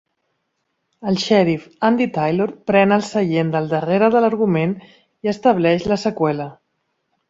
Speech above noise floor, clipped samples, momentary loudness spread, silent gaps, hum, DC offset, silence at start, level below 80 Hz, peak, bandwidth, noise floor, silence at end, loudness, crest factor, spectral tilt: 55 dB; under 0.1%; 9 LU; none; none; under 0.1%; 1 s; -56 dBFS; -2 dBFS; 7.8 kHz; -72 dBFS; 0.75 s; -18 LUFS; 16 dB; -6.5 dB/octave